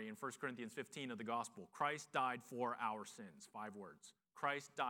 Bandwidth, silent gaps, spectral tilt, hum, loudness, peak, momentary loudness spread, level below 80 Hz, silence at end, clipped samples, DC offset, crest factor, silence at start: 18 kHz; none; -4 dB/octave; none; -45 LUFS; -24 dBFS; 15 LU; under -90 dBFS; 0 s; under 0.1%; under 0.1%; 22 dB; 0 s